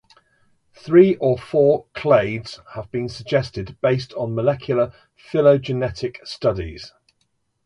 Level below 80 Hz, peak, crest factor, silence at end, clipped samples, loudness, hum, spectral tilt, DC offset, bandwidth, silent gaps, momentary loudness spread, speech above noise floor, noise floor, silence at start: -48 dBFS; -2 dBFS; 20 dB; 0.75 s; under 0.1%; -20 LUFS; none; -7.5 dB/octave; under 0.1%; 10.5 kHz; none; 14 LU; 50 dB; -69 dBFS; 0.85 s